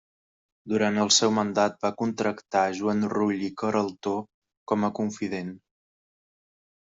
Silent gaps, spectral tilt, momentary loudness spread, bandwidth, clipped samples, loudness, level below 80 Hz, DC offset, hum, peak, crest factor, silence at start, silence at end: 4.34-4.42 s, 4.57-4.66 s; -3.5 dB/octave; 11 LU; 8 kHz; under 0.1%; -26 LUFS; -68 dBFS; under 0.1%; none; -6 dBFS; 22 dB; 0.65 s; 1.3 s